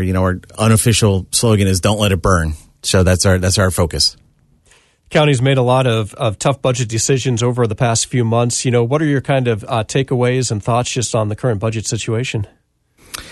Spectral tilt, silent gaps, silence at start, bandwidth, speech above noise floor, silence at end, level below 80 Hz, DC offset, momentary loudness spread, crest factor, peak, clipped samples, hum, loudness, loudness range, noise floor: -4.5 dB/octave; none; 0 s; 12.5 kHz; 38 dB; 0 s; -36 dBFS; under 0.1%; 6 LU; 14 dB; -2 dBFS; under 0.1%; none; -15 LUFS; 3 LU; -53 dBFS